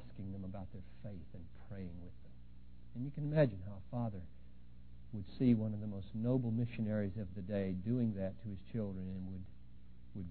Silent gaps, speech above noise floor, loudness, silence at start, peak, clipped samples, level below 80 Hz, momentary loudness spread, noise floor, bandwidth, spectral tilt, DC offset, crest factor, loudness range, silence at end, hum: none; 19 dB; -40 LUFS; 0 s; -18 dBFS; under 0.1%; -58 dBFS; 23 LU; -58 dBFS; 4.3 kHz; -9 dB/octave; 0.3%; 22 dB; 4 LU; 0 s; none